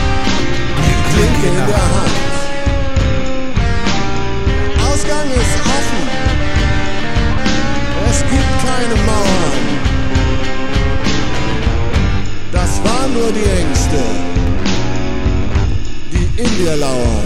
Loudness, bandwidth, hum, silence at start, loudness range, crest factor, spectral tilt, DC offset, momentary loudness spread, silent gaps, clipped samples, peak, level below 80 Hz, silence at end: -16 LUFS; 12 kHz; none; 0 s; 2 LU; 12 dB; -5 dB/octave; under 0.1%; 4 LU; none; under 0.1%; 0 dBFS; -18 dBFS; 0 s